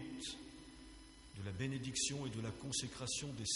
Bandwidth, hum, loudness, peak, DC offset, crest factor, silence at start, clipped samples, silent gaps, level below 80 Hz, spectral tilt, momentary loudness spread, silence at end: 11.5 kHz; none; -42 LUFS; -26 dBFS; under 0.1%; 18 dB; 0 s; under 0.1%; none; -64 dBFS; -3 dB/octave; 18 LU; 0 s